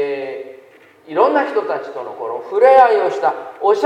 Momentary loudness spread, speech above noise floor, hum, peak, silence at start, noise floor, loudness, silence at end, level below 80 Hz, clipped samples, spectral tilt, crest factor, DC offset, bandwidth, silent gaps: 18 LU; 30 dB; none; 0 dBFS; 0 s; -45 dBFS; -16 LUFS; 0 s; -66 dBFS; under 0.1%; -4.5 dB/octave; 16 dB; under 0.1%; 8.8 kHz; none